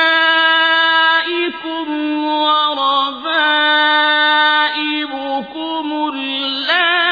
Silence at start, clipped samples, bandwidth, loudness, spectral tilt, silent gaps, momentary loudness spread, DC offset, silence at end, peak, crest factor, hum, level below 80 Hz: 0 s; under 0.1%; 5 kHz; -14 LUFS; -3 dB/octave; none; 10 LU; under 0.1%; 0 s; -2 dBFS; 14 dB; none; -64 dBFS